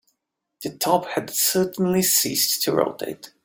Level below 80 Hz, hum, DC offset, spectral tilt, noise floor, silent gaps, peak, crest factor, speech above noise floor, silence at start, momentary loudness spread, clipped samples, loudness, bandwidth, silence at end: -64 dBFS; none; under 0.1%; -3 dB/octave; -78 dBFS; none; -4 dBFS; 18 dB; 55 dB; 0.6 s; 15 LU; under 0.1%; -20 LUFS; 17 kHz; 0.15 s